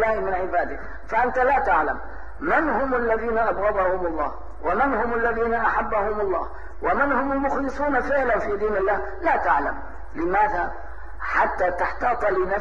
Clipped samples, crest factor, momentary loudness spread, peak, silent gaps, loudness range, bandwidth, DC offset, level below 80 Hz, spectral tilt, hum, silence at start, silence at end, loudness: under 0.1%; 16 dB; 10 LU; -6 dBFS; none; 1 LU; 8 kHz; 2%; -40 dBFS; -7 dB/octave; none; 0 s; 0 s; -23 LUFS